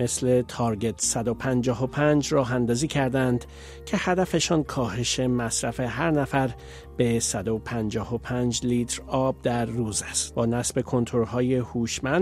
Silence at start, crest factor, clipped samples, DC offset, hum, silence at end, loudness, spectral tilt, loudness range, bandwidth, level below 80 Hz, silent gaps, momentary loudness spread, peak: 0 s; 18 dB; under 0.1%; under 0.1%; none; 0 s; -25 LUFS; -4.5 dB/octave; 2 LU; 15 kHz; -46 dBFS; none; 6 LU; -8 dBFS